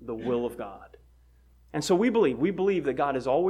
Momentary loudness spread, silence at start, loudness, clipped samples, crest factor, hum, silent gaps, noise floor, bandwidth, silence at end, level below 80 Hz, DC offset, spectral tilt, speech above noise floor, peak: 12 LU; 0 s; -27 LUFS; under 0.1%; 16 dB; none; none; -58 dBFS; 14.5 kHz; 0 s; -56 dBFS; under 0.1%; -6 dB/octave; 32 dB; -12 dBFS